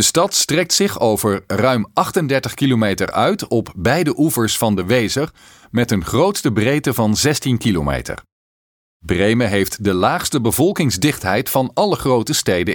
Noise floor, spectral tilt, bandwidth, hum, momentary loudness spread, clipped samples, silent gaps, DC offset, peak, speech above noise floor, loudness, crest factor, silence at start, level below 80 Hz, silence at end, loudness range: under -90 dBFS; -4.5 dB/octave; 19.5 kHz; none; 5 LU; under 0.1%; 8.32-9.00 s; under 0.1%; 0 dBFS; over 73 dB; -17 LUFS; 16 dB; 0 s; -42 dBFS; 0 s; 2 LU